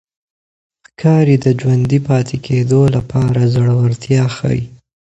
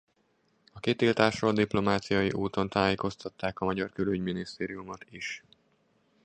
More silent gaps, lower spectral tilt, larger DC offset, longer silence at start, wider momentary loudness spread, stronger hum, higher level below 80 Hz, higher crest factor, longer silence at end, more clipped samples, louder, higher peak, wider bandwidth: neither; first, -8 dB/octave vs -6 dB/octave; neither; first, 1 s vs 0.75 s; second, 6 LU vs 12 LU; neither; first, -42 dBFS vs -56 dBFS; second, 14 dB vs 24 dB; second, 0.3 s vs 0.85 s; neither; first, -14 LUFS vs -29 LUFS; first, 0 dBFS vs -6 dBFS; second, 8.2 kHz vs 9.6 kHz